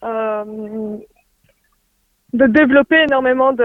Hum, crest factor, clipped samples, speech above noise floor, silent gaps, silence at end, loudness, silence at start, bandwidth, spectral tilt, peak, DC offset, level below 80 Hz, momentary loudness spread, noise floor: none; 16 dB; under 0.1%; 52 dB; none; 0 s; -14 LUFS; 0 s; 4.8 kHz; -7 dB/octave; 0 dBFS; under 0.1%; -50 dBFS; 16 LU; -64 dBFS